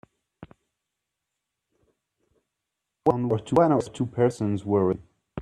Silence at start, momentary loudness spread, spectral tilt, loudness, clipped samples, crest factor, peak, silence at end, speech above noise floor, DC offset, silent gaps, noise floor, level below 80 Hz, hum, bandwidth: 0.4 s; 9 LU; -8 dB/octave; -24 LUFS; under 0.1%; 22 dB; -6 dBFS; 0 s; 61 dB; under 0.1%; none; -84 dBFS; -62 dBFS; none; 11.5 kHz